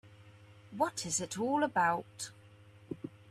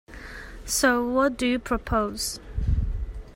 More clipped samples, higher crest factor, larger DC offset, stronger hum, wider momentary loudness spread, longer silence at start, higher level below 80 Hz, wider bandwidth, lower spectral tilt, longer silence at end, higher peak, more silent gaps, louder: neither; about the same, 20 dB vs 20 dB; neither; neither; about the same, 16 LU vs 18 LU; about the same, 0.05 s vs 0.1 s; second, -72 dBFS vs -34 dBFS; second, 14 kHz vs 16 kHz; about the same, -3.5 dB/octave vs -4 dB/octave; about the same, 0 s vs 0 s; second, -18 dBFS vs -6 dBFS; neither; second, -34 LUFS vs -25 LUFS